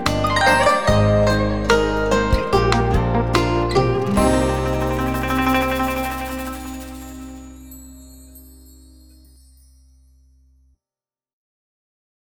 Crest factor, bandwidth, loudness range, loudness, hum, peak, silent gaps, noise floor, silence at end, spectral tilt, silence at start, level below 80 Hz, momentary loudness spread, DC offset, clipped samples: 18 dB; over 20 kHz; 18 LU; -18 LUFS; none; -2 dBFS; none; under -90 dBFS; 3.35 s; -5.5 dB/octave; 0 s; -30 dBFS; 19 LU; under 0.1%; under 0.1%